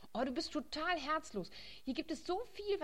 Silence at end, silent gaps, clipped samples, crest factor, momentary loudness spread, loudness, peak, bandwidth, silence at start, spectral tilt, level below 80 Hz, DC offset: 0 s; none; under 0.1%; 18 dB; 9 LU; -40 LUFS; -22 dBFS; 16 kHz; 0 s; -4 dB/octave; -62 dBFS; 0.2%